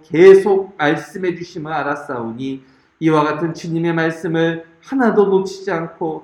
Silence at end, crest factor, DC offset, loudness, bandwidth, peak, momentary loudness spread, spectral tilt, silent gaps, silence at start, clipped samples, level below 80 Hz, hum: 0.05 s; 16 dB; under 0.1%; -17 LUFS; 10.5 kHz; 0 dBFS; 15 LU; -7 dB/octave; none; 0.1 s; under 0.1%; -60 dBFS; none